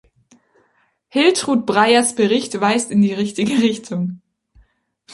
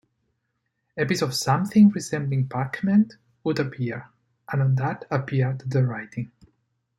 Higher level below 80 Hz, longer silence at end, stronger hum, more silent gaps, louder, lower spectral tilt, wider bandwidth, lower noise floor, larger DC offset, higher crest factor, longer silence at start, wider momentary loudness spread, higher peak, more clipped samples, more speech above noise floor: about the same, -60 dBFS vs -64 dBFS; second, 0 s vs 0.7 s; neither; neither; first, -17 LUFS vs -24 LUFS; second, -4 dB/octave vs -6.5 dB/octave; second, 11.5 kHz vs 13 kHz; second, -62 dBFS vs -76 dBFS; neither; about the same, 18 dB vs 18 dB; first, 1.15 s vs 0.95 s; second, 10 LU vs 14 LU; first, -2 dBFS vs -6 dBFS; neither; second, 46 dB vs 54 dB